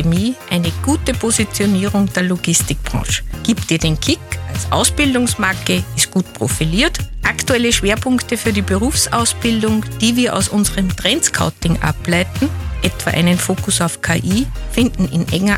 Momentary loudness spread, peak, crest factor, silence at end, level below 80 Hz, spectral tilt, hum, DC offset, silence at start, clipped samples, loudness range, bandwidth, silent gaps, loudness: 5 LU; 0 dBFS; 16 dB; 0 s; -30 dBFS; -4 dB/octave; none; under 0.1%; 0 s; under 0.1%; 2 LU; 17.5 kHz; none; -16 LUFS